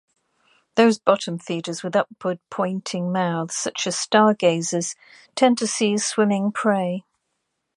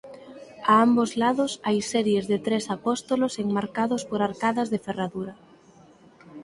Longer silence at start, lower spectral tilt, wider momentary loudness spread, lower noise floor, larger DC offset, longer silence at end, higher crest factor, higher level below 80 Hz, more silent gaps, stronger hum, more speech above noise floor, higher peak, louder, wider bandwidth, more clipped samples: first, 0.75 s vs 0.05 s; about the same, -4 dB/octave vs -5 dB/octave; about the same, 11 LU vs 11 LU; first, -76 dBFS vs -53 dBFS; neither; first, 0.75 s vs 0 s; about the same, 20 dB vs 20 dB; second, -72 dBFS vs -64 dBFS; neither; neither; first, 55 dB vs 29 dB; first, -2 dBFS vs -6 dBFS; about the same, -22 LUFS vs -24 LUFS; about the same, 11.5 kHz vs 11.5 kHz; neither